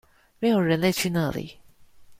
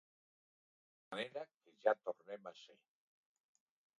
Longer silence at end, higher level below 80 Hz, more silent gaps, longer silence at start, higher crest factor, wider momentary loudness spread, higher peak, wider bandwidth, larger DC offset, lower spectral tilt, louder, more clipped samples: second, 0.05 s vs 1.3 s; first, -54 dBFS vs under -90 dBFS; second, none vs 1.56-1.60 s; second, 0.4 s vs 1.1 s; second, 18 dB vs 28 dB; second, 12 LU vs 19 LU; first, -8 dBFS vs -18 dBFS; first, 16 kHz vs 10 kHz; neither; first, -5.5 dB/octave vs -4 dB/octave; first, -24 LUFS vs -43 LUFS; neither